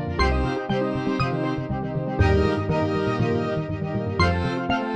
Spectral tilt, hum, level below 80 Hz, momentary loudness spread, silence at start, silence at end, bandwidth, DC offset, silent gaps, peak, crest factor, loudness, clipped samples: -7.5 dB/octave; none; -34 dBFS; 6 LU; 0 s; 0 s; 8.8 kHz; under 0.1%; none; -8 dBFS; 16 dB; -24 LUFS; under 0.1%